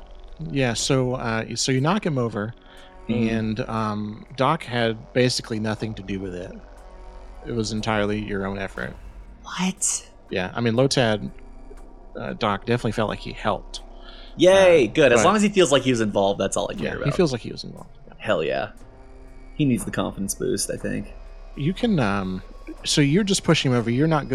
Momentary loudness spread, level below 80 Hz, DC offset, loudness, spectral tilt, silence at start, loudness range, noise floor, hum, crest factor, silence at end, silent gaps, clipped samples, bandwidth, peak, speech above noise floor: 17 LU; -42 dBFS; under 0.1%; -22 LUFS; -4.5 dB/octave; 0 s; 9 LU; -43 dBFS; none; 20 dB; 0 s; none; under 0.1%; 14 kHz; -2 dBFS; 21 dB